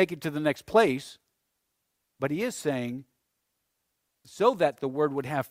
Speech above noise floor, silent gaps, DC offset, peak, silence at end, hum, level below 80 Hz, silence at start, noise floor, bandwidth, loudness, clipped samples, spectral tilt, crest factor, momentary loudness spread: 52 dB; none; under 0.1%; -8 dBFS; 0.05 s; none; -68 dBFS; 0 s; -79 dBFS; 16 kHz; -28 LUFS; under 0.1%; -5.5 dB/octave; 20 dB; 12 LU